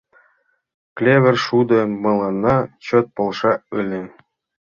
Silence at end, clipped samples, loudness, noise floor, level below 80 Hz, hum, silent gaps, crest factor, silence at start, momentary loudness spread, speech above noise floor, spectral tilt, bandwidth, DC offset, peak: 0.6 s; under 0.1%; -18 LUFS; -62 dBFS; -52 dBFS; none; none; 18 dB; 0.95 s; 11 LU; 45 dB; -7 dB/octave; 7.2 kHz; under 0.1%; -2 dBFS